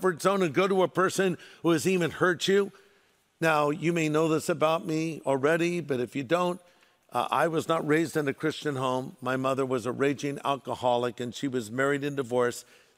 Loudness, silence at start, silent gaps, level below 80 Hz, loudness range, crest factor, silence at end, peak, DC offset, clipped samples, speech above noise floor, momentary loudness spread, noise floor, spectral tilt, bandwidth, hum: -27 LUFS; 0 s; none; -70 dBFS; 3 LU; 18 dB; 0.35 s; -10 dBFS; under 0.1%; under 0.1%; 38 dB; 6 LU; -65 dBFS; -5 dB/octave; 16 kHz; none